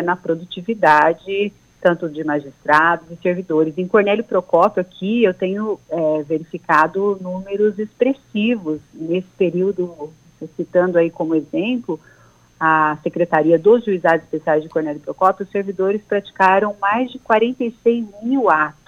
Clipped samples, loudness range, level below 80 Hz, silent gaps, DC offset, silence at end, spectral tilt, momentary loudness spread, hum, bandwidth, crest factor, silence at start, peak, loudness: under 0.1%; 3 LU; -60 dBFS; none; under 0.1%; 0.15 s; -7 dB/octave; 10 LU; none; 9.2 kHz; 16 dB; 0 s; -2 dBFS; -18 LUFS